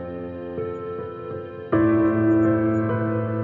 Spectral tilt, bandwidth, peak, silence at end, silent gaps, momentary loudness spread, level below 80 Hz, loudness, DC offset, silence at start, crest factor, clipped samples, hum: -11 dB/octave; 3.4 kHz; -10 dBFS; 0 s; none; 14 LU; -56 dBFS; -23 LUFS; under 0.1%; 0 s; 14 dB; under 0.1%; none